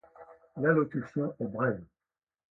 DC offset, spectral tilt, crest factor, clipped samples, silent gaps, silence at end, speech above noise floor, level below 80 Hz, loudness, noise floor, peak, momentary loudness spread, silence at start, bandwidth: under 0.1%; -11 dB/octave; 22 dB; under 0.1%; none; 0.7 s; over 60 dB; -68 dBFS; -31 LUFS; under -90 dBFS; -12 dBFS; 11 LU; 0.2 s; 6 kHz